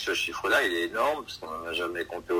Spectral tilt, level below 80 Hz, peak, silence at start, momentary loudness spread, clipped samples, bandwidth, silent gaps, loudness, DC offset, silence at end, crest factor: -2.5 dB/octave; -58 dBFS; -12 dBFS; 0 s; 11 LU; under 0.1%; 16 kHz; none; -28 LUFS; under 0.1%; 0 s; 18 dB